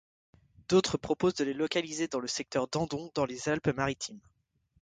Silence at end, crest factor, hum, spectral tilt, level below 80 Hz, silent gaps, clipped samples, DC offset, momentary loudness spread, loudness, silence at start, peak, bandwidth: 0.6 s; 20 dB; none; -4.5 dB/octave; -60 dBFS; none; under 0.1%; under 0.1%; 6 LU; -31 LUFS; 0.7 s; -14 dBFS; 9.6 kHz